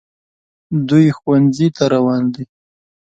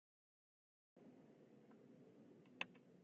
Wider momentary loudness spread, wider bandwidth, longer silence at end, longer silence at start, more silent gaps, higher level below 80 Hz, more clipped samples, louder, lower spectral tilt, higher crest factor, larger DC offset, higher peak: second, 10 LU vs 16 LU; first, 8 kHz vs 7 kHz; first, 0.6 s vs 0 s; second, 0.7 s vs 0.95 s; neither; first, -54 dBFS vs under -90 dBFS; neither; first, -15 LUFS vs -59 LUFS; first, -7.5 dB/octave vs -2 dB/octave; second, 16 dB vs 34 dB; neither; first, 0 dBFS vs -28 dBFS